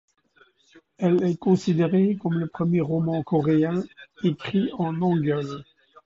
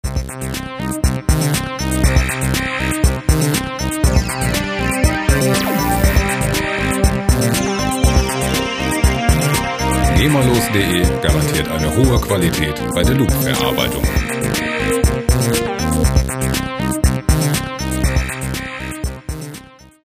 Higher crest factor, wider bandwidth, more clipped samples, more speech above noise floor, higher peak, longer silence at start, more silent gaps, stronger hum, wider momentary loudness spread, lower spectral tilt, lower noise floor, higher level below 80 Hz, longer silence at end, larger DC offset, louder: about the same, 16 dB vs 16 dB; second, 7.6 kHz vs 16 kHz; neither; first, 37 dB vs 22 dB; second, -8 dBFS vs 0 dBFS; first, 1 s vs 0.05 s; neither; neither; about the same, 7 LU vs 8 LU; first, -8.5 dB/octave vs -4.5 dB/octave; first, -60 dBFS vs -38 dBFS; second, -62 dBFS vs -22 dBFS; about the same, 0.45 s vs 0.4 s; neither; second, -24 LUFS vs -17 LUFS